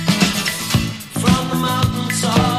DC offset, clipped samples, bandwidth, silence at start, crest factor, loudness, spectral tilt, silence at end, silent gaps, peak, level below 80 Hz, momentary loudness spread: under 0.1%; under 0.1%; 15.5 kHz; 0 s; 18 dB; -18 LUFS; -4.5 dB/octave; 0 s; none; 0 dBFS; -36 dBFS; 4 LU